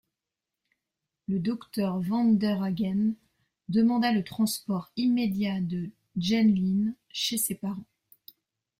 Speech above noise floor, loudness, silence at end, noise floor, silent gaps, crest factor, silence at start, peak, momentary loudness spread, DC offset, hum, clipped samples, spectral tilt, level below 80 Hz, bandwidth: 62 dB; -27 LUFS; 0.95 s; -88 dBFS; none; 14 dB; 1.3 s; -14 dBFS; 11 LU; under 0.1%; none; under 0.1%; -5 dB/octave; -64 dBFS; 16 kHz